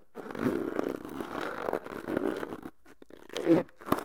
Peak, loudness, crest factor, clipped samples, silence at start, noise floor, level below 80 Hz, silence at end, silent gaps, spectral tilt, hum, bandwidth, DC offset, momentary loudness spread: -8 dBFS; -33 LUFS; 24 dB; under 0.1%; 0.15 s; -55 dBFS; -64 dBFS; 0 s; none; -6 dB/octave; none; 17.5 kHz; 0.2%; 15 LU